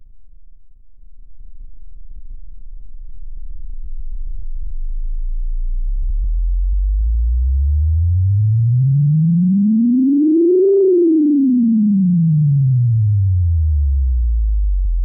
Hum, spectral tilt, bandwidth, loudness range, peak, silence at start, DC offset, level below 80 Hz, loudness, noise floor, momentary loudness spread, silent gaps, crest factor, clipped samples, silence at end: none; -19 dB/octave; 0.8 kHz; 18 LU; -8 dBFS; 0 s; under 0.1%; -20 dBFS; -15 LUFS; -37 dBFS; 20 LU; none; 8 dB; under 0.1%; 0 s